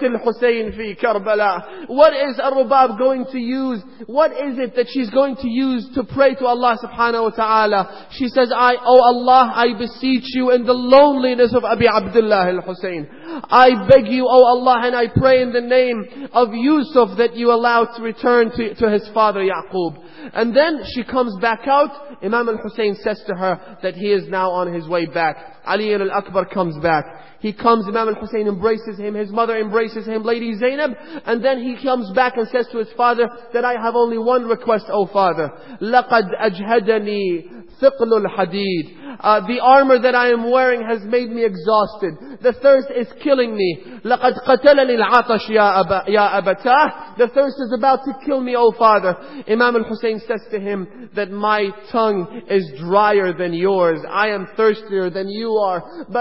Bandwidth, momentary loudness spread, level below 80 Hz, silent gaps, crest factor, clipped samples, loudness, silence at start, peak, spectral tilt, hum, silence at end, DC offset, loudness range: 5.8 kHz; 11 LU; -50 dBFS; none; 16 dB; under 0.1%; -17 LUFS; 0 s; 0 dBFS; -8.5 dB/octave; none; 0 s; 0.6%; 6 LU